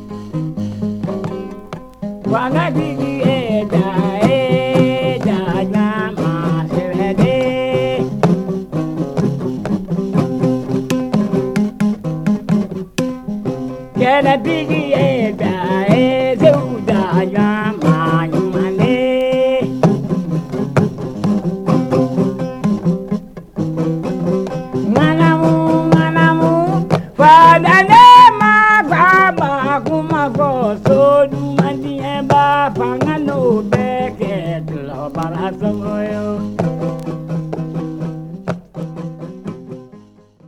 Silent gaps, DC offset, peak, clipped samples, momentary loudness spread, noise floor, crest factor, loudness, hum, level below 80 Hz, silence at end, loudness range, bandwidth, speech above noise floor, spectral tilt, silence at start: none; under 0.1%; 0 dBFS; 0.2%; 13 LU; -44 dBFS; 14 dB; -14 LUFS; none; -44 dBFS; 0.5 s; 12 LU; 13 kHz; 29 dB; -7 dB/octave; 0 s